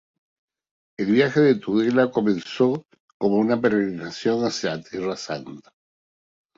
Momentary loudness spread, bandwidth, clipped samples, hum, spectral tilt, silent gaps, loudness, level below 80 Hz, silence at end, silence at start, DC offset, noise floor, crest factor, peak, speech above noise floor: 11 LU; 7.8 kHz; under 0.1%; none; -6 dB/octave; 3.00-3.08 s, 3.14-3.20 s; -22 LUFS; -64 dBFS; 0.95 s; 1 s; under 0.1%; under -90 dBFS; 18 dB; -6 dBFS; over 68 dB